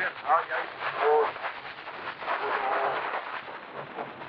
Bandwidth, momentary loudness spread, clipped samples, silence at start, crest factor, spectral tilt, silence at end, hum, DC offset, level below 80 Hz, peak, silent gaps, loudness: 5.8 kHz; 14 LU; under 0.1%; 0 s; 18 dB; 0 dB/octave; 0 s; none; under 0.1%; -74 dBFS; -10 dBFS; none; -29 LUFS